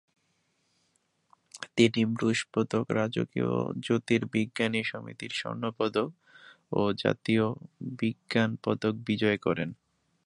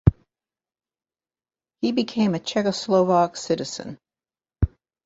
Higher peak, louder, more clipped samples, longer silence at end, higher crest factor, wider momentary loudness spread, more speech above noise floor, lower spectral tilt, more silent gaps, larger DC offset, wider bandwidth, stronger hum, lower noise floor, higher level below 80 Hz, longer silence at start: second, -8 dBFS vs -2 dBFS; second, -29 LUFS vs -23 LUFS; neither; about the same, 0.5 s vs 0.4 s; about the same, 22 dB vs 22 dB; about the same, 8 LU vs 9 LU; second, 45 dB vs over 68 dB; about the same, -6 dB/octave vs -6.5 dB/octave; neither; neither; first, 11 kHz vs 8 kHz; neither; second, -74 dBFS vs under -90 dBFS; second, -66 dBFS vs -38 dBFS; first, 1.55 s vs 0.05 s